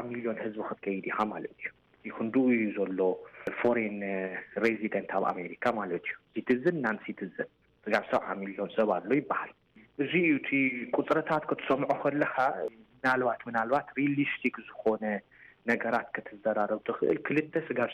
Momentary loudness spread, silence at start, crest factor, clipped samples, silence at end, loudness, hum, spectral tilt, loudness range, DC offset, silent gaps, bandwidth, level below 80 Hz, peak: 10 LU; 0 s; 16 dB; under 0.1%; 0 s; -31 LUFS; none; -7.5 dB/octave; 3 LU; under 0.1%; none; 9.8 kHz; -72 dBFS; -16 dBFS